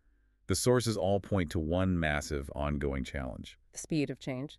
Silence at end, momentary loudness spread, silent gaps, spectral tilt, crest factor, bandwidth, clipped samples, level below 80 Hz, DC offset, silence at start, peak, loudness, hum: 0.05 s; 12 LU; none; -5.5 dB/octave; 18 dB; 13.5 kHz; under 0.1%; -46 dBFS; under 0.1%; 0.5 s; -14 dBFS; -32 LUFS; none